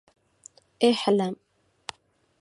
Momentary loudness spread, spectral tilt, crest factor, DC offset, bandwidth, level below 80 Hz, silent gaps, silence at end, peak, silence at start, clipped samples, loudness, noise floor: 19 LU; -5 dB/octave; 20 dB; under 0.1%; 11.5 kHz; -74 dBFS; none; 1.05 s; -8 dBFS; 0.8 s; under 0.1%; -24 LUFS; -63 dBFS